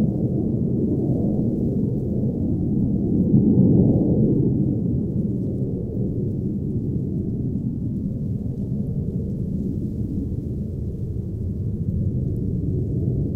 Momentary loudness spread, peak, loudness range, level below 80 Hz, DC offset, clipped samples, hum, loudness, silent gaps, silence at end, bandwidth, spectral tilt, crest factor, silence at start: 9 LU; -4 dBFS; 7 LU; -36 dBFS; under 0.1%; under 0.1%; none; -23 LUFS; none; 0 s; 1.3 kHz; -13.5 dB/octave; 18 dB; 0 s